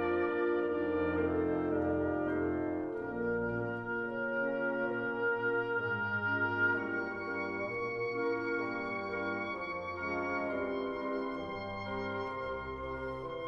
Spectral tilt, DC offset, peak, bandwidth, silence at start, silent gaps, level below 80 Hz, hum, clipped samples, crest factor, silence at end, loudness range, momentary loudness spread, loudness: -8 dB/octave; under 0.1%; -20 dBFS; 6.8 kHz; 0 s; none; -60 dBFS; none; under 0.1%; 14 dB; 0 s; 4 LU; 6 LU; -35 LUFS